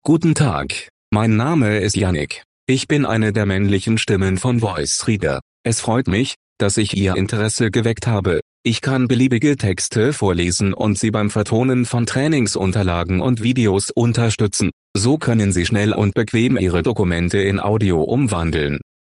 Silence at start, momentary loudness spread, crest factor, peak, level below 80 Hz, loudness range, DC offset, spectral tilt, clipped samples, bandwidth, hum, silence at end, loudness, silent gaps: 0.05 s; 5 LU; 16 dB; -2 dBFS; -44 dBFS; 1 LU; under 0.1%; -5.5 dB/octave; under 0.1%; 11.5 kHz; none; 0.2 s; -18 LUFS; 0.90-1.12 s, 2.45-2.67 s, 5.42-5.64 s, 6.36-6.56 s, 8.42-8.64 s, 14.73-14.95 s